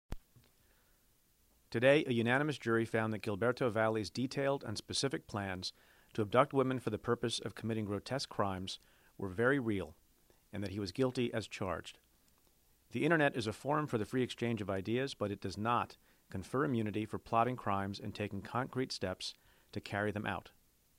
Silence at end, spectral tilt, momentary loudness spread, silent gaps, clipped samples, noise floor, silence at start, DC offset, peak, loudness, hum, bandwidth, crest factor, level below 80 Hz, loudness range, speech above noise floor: 0.5 s; -5.5 dB/octave; 13 LU; none; under 0.1%; -71 dBFS; 0.1 s; under 0.1%; -14 dBFS; -36 LUFS; none; 16 kHz; 22 dB; -64 dBFS; 5 LU; 36 dB